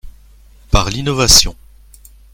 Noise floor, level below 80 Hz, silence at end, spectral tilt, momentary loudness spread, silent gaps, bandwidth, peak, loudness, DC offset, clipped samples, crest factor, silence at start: -43 dBFS; -24 dBFS; 0.8 s; -2.5 dB/octave; 10 LU; none; over 20 kHz; 0 dBFS; -12 LUFS; under 0.1%; 0.3%; 16 dB; 0.05 s